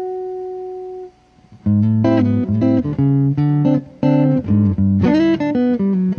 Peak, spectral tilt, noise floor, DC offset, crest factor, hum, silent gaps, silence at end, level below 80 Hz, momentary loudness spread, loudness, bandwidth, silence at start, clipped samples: -4 dBFS; -10 dB/octave; -47 dBFS; under 0.1%; 12 dB; none; none; 0 s; -44 dBFS; 13 LU; -16 LUFS; 6.6 kHz; 0 s; under 0.1%